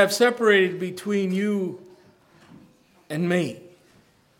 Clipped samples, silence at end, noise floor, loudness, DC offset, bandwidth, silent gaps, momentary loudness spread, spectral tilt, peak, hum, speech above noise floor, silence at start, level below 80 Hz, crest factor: under 0.1%; 0.75 s; -58 dBFS; -23 LUFS; under 0.1%; 18 kHz; none; 15 LU; -5 dB/octave; -2 dBFS; none; 36 dB; 0 s; -74 dBFS; 22 dB